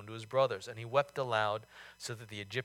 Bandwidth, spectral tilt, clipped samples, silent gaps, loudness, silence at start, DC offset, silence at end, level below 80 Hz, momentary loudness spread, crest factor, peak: 16 kHz; -4.5 dB/octave; under 0.1%; none; -35 LUFS; 0 s; under 0.1%; 0 s; -76 dBFS; 12 LU; 22 dB; -14 dBFS